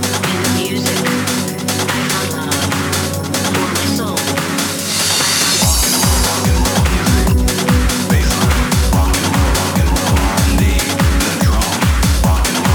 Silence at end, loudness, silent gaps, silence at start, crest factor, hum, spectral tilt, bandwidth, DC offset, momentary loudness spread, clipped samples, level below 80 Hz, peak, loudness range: 0 s; -14 LUFS; none; 0 s; 12 dB; none; -4 dB/octave; over 20 kHz; under 0.1%; 5 LU; under 0.1%; -20 dBFS; -2 dBFS; 3 LU